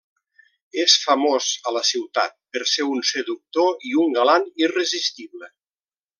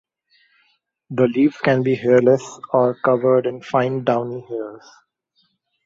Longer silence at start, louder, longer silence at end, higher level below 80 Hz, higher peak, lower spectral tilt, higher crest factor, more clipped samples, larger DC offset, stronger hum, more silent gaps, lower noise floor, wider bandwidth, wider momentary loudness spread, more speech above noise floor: second, 0.75 s vs 1.1 s; about the same, -20 LUFS vs -19 LUFS; second, 0.7 s vs 1.1 s; second, -84 dBFS vs -64 dBFS; about the same, -2 dBFS vs -2 dBFS; second, -0.5 dB/octave vs -7.5 dB/octave; about the same, 20 dB vs 18 dB; neither; neither; neither; neither; first, under -90 dBFS vs -66 dBFS; first, 10.5 kHz vs 7.8 kHz; second, 10 LU vs 14 LU; first, over 69 dB vs 48 dB